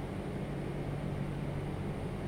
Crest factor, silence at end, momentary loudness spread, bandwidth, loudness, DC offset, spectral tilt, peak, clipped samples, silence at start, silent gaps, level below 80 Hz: 12 dB; 0 s; 1 LU; 15 kHz; -38 LUFS; under 0.1%; -8 dB/octave; -26 dBFS; under 0.1%; 0 s; none; -48 dBFS